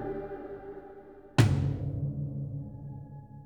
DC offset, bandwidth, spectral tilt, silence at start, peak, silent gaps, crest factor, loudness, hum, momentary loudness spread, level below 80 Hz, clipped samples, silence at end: under 0.1%; 17.5 kHz; -7 dB/octave; 0 s; -8 dBFS; none; 24 dB; -32 LUFS; none; 21 LU; -48 dBFS; under 0.1%; 0 s